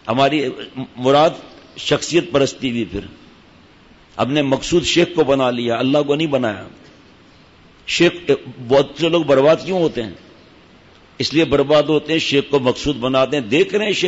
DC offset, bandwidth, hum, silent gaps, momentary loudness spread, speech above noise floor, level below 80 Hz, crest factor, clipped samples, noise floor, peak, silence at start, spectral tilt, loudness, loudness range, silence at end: under 0.1%; 8 kHz; none; none; 12 LU; 31 dB; -46 dBFS; 14 dB; under 0.1%; -47 dBFS; -4 dBFS; 0.05 s; -5 dB/octave; -17 LUFS; 2 LU; 0 s